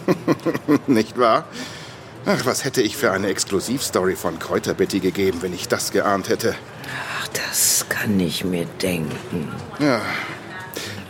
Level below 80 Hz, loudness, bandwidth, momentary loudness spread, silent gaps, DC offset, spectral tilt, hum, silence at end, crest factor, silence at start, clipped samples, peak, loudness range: -58 dBFS; -21 LUFS; 17 kHz; 12 LU; none; under 0.1%; -3.5 dB/octave; none; 0 s; 18 dB; 0 s; under 0.1%; -4 dBFS; 2 LU